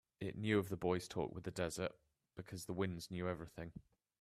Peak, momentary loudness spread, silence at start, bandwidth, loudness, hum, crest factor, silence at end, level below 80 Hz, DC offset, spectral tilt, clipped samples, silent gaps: -22 dBFS; 15 LU; 0.2 s; 15 kHz; -42 LUFS; none; 22 dB; 0.4 s; -68 dBFS; under 0.1%; -5.5 dB/octave; under 0.1%; none